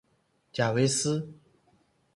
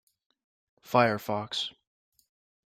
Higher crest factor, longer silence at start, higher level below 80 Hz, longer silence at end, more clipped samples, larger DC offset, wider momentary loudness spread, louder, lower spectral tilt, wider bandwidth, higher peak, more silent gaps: about the same, 20 dB vs 24 dB; second, 0.55 s vs 0.85 s; first, -66 dBFS vs -72 dBFS; second, 0.8 s vs 0.95 s; neither; neither; first, 14 LU vs 8 LU; about the same, -28 LUFS vs -28 LUFS; about the same, -4.5 dB/octave vs -5 dB/octave; second, 11.5 kHz vs 16 kHz; second, -12 dBFS vs -8 dBFS; neither